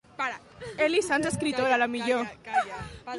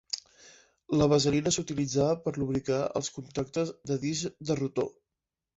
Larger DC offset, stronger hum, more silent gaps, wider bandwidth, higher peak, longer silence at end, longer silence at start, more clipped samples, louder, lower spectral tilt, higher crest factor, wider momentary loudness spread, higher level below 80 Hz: neither; neither; neither; first, 11.5 kHz vs 8.2 kHz; about the same, -12 dBFS vs -12 dBFS; second, 0 s vs 0.65 s; about the same, 0.2 s vs 0.15 s; neither; first, -27 LUFS vs -30 LUFS; about the same, -4 dB/octave vs -5 dB/octave; about the same, 16 dB vs 18 dB; first, 13 LU vs 10 LU; about the same, -56 dBFS vs -58 dBFS